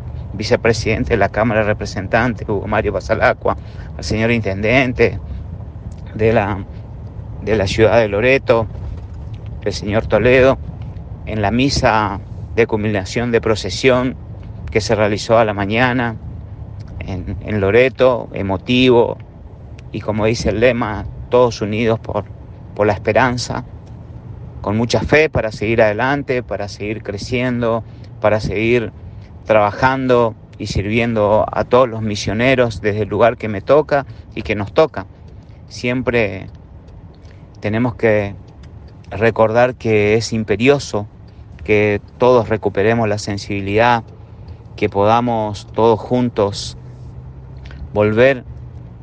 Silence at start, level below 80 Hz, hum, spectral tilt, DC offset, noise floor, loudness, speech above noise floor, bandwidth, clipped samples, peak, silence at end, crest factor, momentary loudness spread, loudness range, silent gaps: 0 s; -36 dBFS; none; -6 dB/octave; under 0.1%; -38 dBFS; -16 LUFS; 23 dB; 9.4 kHz; under 0.1%; 0 dBFS; 0 s; 16 dB; 18 LU; 3 LU; none